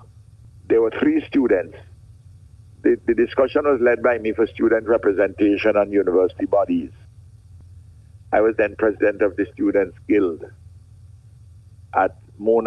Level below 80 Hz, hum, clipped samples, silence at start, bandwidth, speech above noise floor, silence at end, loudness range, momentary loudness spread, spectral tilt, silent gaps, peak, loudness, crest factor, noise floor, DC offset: -50 dBFS; none; under 0.1%; 0.7 s; 6 kHz; 27 dB; 0 s; 4 LU; 6 LU; -8 dB/octave; none; -4 dBFS; -20 LUFS; 16 dB; -46 dBFS; under 0.1%